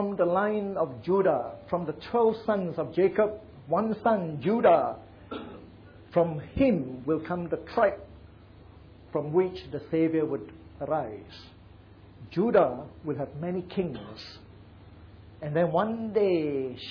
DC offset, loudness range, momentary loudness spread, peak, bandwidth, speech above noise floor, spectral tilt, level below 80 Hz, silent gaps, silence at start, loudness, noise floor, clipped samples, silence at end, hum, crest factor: under 0.1%; 4 LU; 16 LU; -10 dBFS; 5.4 kHz; 24 dB; -9.5 dB/octave; -56 dBFS; none; 0 s; -28 LUFS; -51 dBFS; under 0.1%; 0 s; none; 18 dB